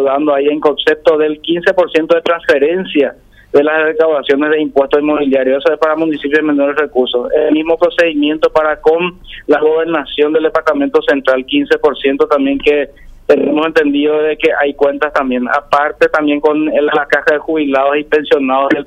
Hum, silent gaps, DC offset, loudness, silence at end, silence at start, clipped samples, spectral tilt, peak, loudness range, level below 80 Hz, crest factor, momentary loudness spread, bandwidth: none; none; under 0.1%; -12 LUFS; 0 s; 0 s; under 0.1%; -5.5 dB/octave; 0 dBFS; 1 LU; -44 dBFS; 12 dB; 3 LU; 8.6 kHz